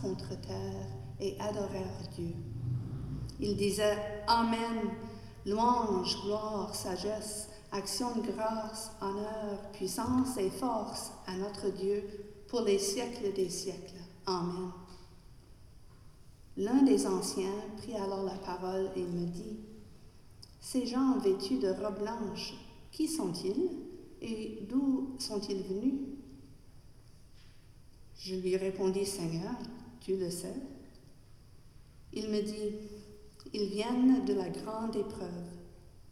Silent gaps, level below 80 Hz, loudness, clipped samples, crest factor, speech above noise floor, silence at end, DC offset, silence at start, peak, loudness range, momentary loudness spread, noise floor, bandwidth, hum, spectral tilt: none; -56 dBFS; -35 LUFS; under 0.1%; 20 dB; 22 dB; 0 s; under 0.1%; 0 s; -16 dBFS; 7 LU; 16 LU; -55 dBFS; 14.5 kHz; none; -5 dB/octave